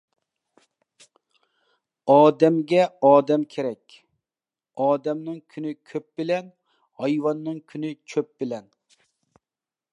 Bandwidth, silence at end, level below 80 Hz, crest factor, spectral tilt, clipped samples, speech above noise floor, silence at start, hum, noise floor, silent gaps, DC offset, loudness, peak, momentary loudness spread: 9.6 kHz; 1.35 s; -82 dBFS; 22 dB; -7 dB/octave; under 0.1%; over 68 dB; 2.05 s; none; under -90 dBFS; none; under 0.1%; -23 LUFS; -4 dBFS; 17 LU